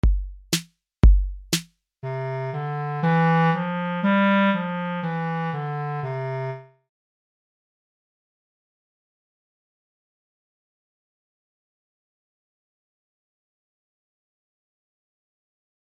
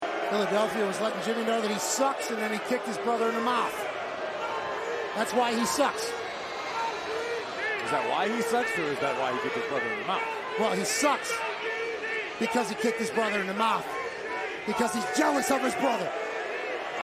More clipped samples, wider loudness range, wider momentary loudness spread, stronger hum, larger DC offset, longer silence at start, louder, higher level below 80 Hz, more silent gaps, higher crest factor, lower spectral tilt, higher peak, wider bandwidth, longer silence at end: neither; first, 12 LU vs 2 LU; first, 11 LU vs 7 LU; neither; neither; about the same, 0.05 s vs 0 s; first, -24 LUFS vs -28 LUFS; first, -30 dBFS vs -68 dBFS; neither; about the same, 22 dB vs 18 dB; first, -6 dB/octave vs -3 dB/octave; first, -4 dBFS vs -10 dBFS; about the same, 16 kHz vs 15 kHz; first, 9.35 s vs 0 s